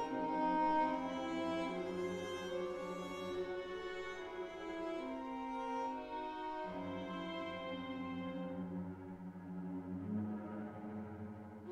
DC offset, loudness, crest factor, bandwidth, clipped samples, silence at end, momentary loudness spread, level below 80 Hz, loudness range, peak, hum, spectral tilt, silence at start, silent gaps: under 0.1%; -42 LUFS; 18 dB; 13.5 kHz; under 0.1%; 0 s; 11 LU; -70 dBFS; 6 LU; -24 dBFS; none; -6.5 dB/octave; 0 s; none